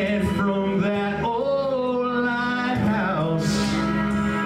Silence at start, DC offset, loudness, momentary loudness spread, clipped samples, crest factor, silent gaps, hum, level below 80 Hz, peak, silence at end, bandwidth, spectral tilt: 0 s; under 0.1%; -23 LUFS; 1 LU; under 0.1%; 10 dB; none; none; -44 dBFS; -12 dBFS; 0 s; 13.5 kHz; -6 dB/octave